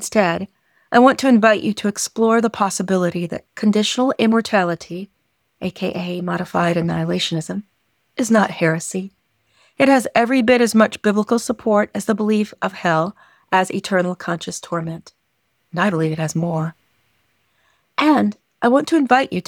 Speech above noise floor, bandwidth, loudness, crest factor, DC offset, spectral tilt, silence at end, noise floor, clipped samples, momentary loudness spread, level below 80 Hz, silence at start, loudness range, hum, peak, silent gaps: 50 dB; 17 kHz; -18 LUFS; 16 dB; under 0.1%; -5 dB/octave; 0.05 s; -68 dBFS; under 0.1%; 13 LU; -60 dBFS; 0 s; 6 LU; none; -2 dBFS; none